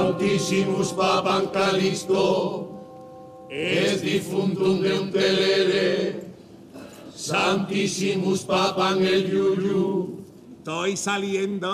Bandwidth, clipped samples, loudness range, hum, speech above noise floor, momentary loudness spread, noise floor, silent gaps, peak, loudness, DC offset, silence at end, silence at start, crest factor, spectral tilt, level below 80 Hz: 14.5 kHz; under 0.1%; 2 LU; none; 21 dB; 19 LU; -43 dBFS; none; -10 dBFS; -23 LUFS; under 0.1%; 0 s; 0 s; 14 dB; -4.5 dB/octave; -62 dBFS